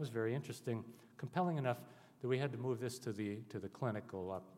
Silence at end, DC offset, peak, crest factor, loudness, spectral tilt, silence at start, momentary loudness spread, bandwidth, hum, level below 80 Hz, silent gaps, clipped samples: 0 s; under 0.1%; -22 dBFS; 18 dB; -42 LUFS; -6.5 dB/octave; 0 s; 9 LU; 16 kHz; none; -88 dBFS; none; under 0.1%